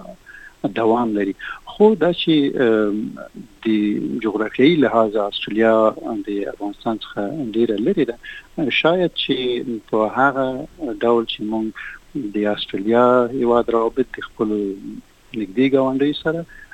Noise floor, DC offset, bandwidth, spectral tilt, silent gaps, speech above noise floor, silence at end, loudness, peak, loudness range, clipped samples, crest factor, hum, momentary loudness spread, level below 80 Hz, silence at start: -42 dBFS; under 0.1%; 9 kHz; -7 dB/octave; none; 23 dB; 0.1 s; -19 LUFS; -2 dBFS; 3 LU; under 0.1%; 18 dB; none; 14 LU; -50 dBFS; 0 s